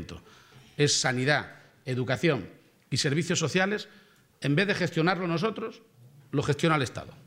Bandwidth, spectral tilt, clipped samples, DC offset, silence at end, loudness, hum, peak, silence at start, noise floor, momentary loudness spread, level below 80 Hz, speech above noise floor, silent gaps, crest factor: 16 kHz; -4.5 dB/octave; under 0.1%; under 0.1%; 0.05 s; -27 LUFS; none; -8 dBFS; 0 s; -54 dBFS; 18 LU; -64 dBFS; 27 dB; none; 20 dB